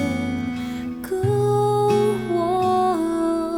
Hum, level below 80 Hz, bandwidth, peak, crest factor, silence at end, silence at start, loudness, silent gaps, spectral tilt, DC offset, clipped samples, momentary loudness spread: none; -52 dBFS; 17 kHz; -8 dBFS; 14 dB; 0 s; 0 s; -21 LUFS; none; -7 dB/octave; under 0.1%; under 0.1%; 9 LU